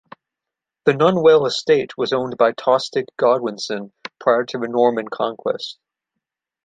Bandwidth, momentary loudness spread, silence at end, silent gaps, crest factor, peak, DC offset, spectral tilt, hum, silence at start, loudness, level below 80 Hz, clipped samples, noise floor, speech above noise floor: 9.2 kHz; 12 LU; 0.95 s; none; 18 dB; -2 dBFS; under 0.1%; -5 dB/octave; none; 0.85 s; -19 LUFS; -68 dBFS; under 0.1%; -86 dBFS; 68 dB